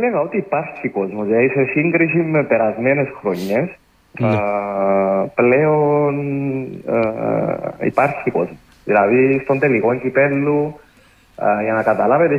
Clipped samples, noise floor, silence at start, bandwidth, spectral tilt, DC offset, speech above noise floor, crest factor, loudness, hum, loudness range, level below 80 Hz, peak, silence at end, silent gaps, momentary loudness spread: under 0.1%; -51 dBFS; 0 s; 15 kHz; -9 dB/octave; under 0.1%; 34 dB; 16 dB; -17 LUFS; none; 1 LU; -56 dBFS; -2 dBFS; 0 s; none; 8 LU